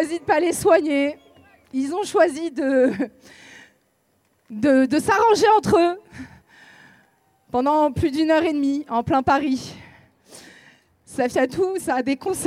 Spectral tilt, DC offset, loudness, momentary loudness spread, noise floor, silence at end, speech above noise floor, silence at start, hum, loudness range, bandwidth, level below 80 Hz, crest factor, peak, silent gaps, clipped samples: -5 dB/octave; under 0.1%; -20 LUFS; 13 LU; -65 dBFS; 0 s; 46 dB; 0 s; none; 4 LU; 15.5 kHz; -54 dBFS; 16 dB; -4 dBFS; none; under 0.1%